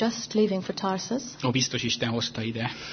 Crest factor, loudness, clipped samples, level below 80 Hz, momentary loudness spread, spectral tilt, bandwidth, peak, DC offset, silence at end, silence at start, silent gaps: 16 dB; -27 LUFS; under 0.1%; -60 dBFS; 5 LU; -4 dB/octave; 6.6 kHz; -10 dBFS; under 0.1%; 0 s; 0 s; none